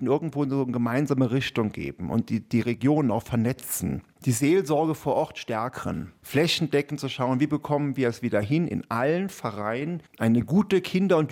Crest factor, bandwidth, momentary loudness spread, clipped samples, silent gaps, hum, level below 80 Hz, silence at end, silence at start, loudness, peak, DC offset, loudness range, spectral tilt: 16 dB; 16.5 kHz; 8 LU; under 0.1%; none; none; -58 dBFS; 0 s; 0 s; -26 LUFS; -10 dBFS; under 0.1%; 1 LU; -6 dB/octave